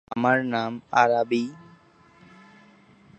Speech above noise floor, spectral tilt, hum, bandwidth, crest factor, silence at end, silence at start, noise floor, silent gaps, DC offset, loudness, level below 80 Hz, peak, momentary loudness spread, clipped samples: 32 dB; -5.5 dB/octave; none; 8.6 kHz; 24 dB; 1.55 s; 0.1 s; -55 dBFS; none; under 0.1%; -23 LUFS; -70 dBFS; -4 dBFS; 8 LU; under 0.1%